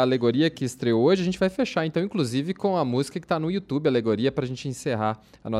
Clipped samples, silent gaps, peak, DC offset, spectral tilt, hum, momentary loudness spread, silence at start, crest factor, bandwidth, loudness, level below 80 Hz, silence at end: under 0.1%; none; -8 dBFS; under 0.1%; -6.5 dB/octave; none; 7 LU; 0 s; 16 dB; 14 kHz; -25 LUFS; -58 dBFS; 0 s